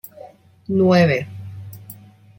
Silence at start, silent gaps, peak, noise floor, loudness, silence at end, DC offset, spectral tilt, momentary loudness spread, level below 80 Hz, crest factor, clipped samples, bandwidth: 0.25 s; none; -4 dBFS; -44 dBFS; -17 LUFS; 0.45 s; under 0.1%; -7.5 dB/octave; 25 LU; -58 dBFS; 18 dB; under 0.1%; 17 kHz